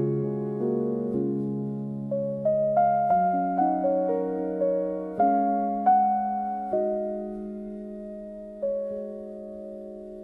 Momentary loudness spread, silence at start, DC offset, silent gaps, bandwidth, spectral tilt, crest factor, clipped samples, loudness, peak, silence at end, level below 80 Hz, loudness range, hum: 16 LU; 0 s; under 0.1%; none; 3 kHz; -11.5 dB/octave; 14 dB; under 0.1%; -26 LUFS; -12 dBFS; 0 s; -60 dBFS; 8 LU; none